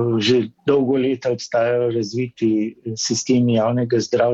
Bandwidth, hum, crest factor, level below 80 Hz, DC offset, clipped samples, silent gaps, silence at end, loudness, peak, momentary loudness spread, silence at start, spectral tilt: 8 kHz; none; 14 dB; -60 dBFS; under 0.1%; under 0.1%; none; 0 s; -19 LUFS; -6 dBFS; 6 LU; 0 s; -5.5 dB/octave